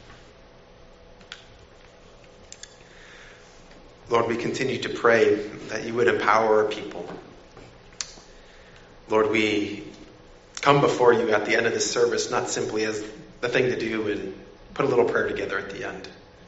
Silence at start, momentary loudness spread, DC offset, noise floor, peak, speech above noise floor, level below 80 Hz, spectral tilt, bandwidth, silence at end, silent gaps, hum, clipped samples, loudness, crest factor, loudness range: 0.05 s; 24 LU; under 0.1%; -50 dBFS; -2 dBFS; 27 dB; -54 dBFS; -3 dB/octave; 8 kHz; 0.3 s; none; none; under 0.1%; -23 LUFS; 24 dB; 6 LU